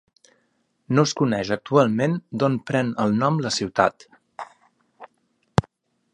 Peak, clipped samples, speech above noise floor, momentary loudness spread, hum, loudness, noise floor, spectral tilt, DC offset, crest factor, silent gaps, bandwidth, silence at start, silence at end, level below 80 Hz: 0 dBFS; under 0.1%; 48 dB; 6 LU; none; -22 LUFS; -69 dBFS; -6 dB/octave; under 0.1%; 24 dB; none; 11 kHz; 0.9 s; 0.55 s; -54 dBFS